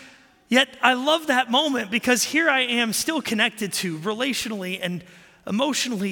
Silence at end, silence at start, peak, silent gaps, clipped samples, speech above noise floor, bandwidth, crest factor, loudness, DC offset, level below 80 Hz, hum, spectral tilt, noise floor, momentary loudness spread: 0 s; 0 s; -2 dBFS; none; under 0.1%; 28 dB; 17 kHz; 22 dB; -22 LUFS; under 0.1%; -66 dBFS; none; -2.5 dB/octave; -50 dBFS; 9 LU